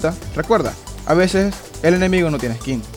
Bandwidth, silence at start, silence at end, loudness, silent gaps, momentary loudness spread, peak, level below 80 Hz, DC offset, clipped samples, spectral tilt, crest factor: 19 kHz; 0 s; 0 s; -18 LUFS; none; 10 LU; -2 dBFS; -36 dBFS; under 0.1%; under 0.1%; -6 dB/octave; 16 dB